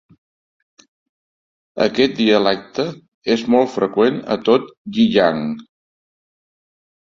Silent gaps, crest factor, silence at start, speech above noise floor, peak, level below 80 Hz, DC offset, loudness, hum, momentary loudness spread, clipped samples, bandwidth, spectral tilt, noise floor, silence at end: 3.08-3.22 s, 4.77-4.85 s; 18 dB; 1.75 s; over 73 dB; 0 dBFS; -58 dBFS; under 0.1%; -17 LUFS; none; 12 LU; under 0.1%; 7.4 kHz; -6 dB/octave; under -90 dBFS; 1.4 s